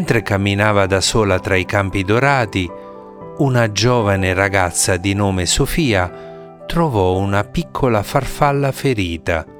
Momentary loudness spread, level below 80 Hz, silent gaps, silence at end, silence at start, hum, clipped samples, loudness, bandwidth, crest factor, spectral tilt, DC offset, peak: 9 LU; -34 dBFS; none; 0 s; 0 s; none; under 0.1%; -16 LUFS; 19 kHz; 16 dB; -4.5 dB/octave; under 0.1%; 0 dBFS